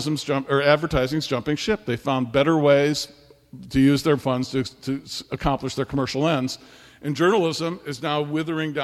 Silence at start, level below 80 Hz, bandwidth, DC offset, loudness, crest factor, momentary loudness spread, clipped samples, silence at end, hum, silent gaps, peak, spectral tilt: 0 s; -46 dBFS; 14 kHz; under 0.1%; -23 LUFS; 20 dB; 11 LU; under 0.1%; 0 s; none; none; -2 dBFS; -5.5 dB/octave